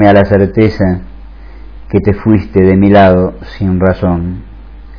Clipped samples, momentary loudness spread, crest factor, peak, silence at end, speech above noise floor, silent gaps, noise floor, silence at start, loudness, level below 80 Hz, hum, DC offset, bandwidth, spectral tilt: 1%; 12 LU; 10 dB; 0 dBFS; 0 s; 21 dB; none; -29 dBFS; 0 s; -10 LUFS; -28 dBFS; none; 0.7%; 5.4 kHz; -10 dB/octave